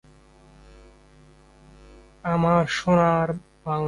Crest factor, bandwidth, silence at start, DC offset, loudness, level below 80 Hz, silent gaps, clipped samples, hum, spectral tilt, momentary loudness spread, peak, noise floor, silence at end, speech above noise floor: 18 dB; 11 kHz; 2.25 s; under 0.1%; -22 LUFS; -50 dBFS; none; under 0.1%; none; -7 dB/octave; 12 LU; -8 dBFS; -53 dBFS; 0 s; 32 dB